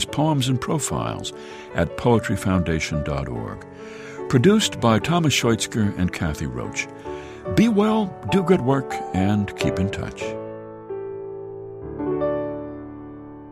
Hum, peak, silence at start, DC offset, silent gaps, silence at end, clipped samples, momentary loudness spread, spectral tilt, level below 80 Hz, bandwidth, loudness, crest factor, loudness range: none; -4 dBFS; 0 s; under 0.1%; none; 0 s; under 0.1%; 17 LU; -5.5 dB/octave; -42 dBFS; 15 kHz; -22 LUFS; 18 dB; 7 LU